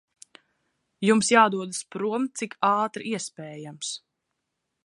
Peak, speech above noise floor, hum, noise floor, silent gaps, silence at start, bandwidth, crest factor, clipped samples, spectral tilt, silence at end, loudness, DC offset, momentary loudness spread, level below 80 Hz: -4 dBFS; 56 dB; none; -81 dBFS; none; 1 s; 11.5 kHz; 24 dB; under 0.1%; -3.5 dB/octave; 0.9 s; -24 LUFS; under 0.1%; 16 LU; -74 dBFS